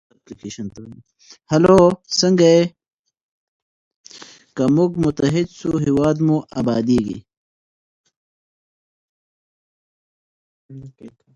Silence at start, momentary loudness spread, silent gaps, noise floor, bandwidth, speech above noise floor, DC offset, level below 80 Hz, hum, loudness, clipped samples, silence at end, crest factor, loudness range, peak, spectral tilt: 0.3 s; 20 LU; 2.94-3.04 s, 3.23-4.04 s, 7.37-8.04 s, 8.16-10.69 s; -43 dBFS; 11 kHz; 25 dB; under 0.1%; -50 dBFS; none; -17 LUFS; under 0.1%; 0.25 s; 20 dB; 7 LU; 0 dBFS; -6 dB/octave